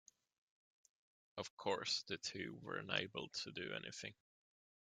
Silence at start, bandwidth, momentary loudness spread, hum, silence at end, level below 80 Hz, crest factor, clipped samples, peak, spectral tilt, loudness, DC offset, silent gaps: 1.35 s; 12.5 kHz; 10 LU; none; 0.7 s; -84 dBFS; 28 dB; under 0.1%; -20 dBFS; -2.5 dB/octave; -45 LUFS; under 0.1%; 1.50-1.57 s